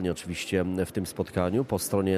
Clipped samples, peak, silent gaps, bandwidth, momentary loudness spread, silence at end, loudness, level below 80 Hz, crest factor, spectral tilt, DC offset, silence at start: under 0.1%; -10 dBFS; none; 14.5 kHz; 4 LU; 0 s; -29 LUFS; -52 dBFS; 18 dB; -5.5 dB/octave; under 0.1%; 0 s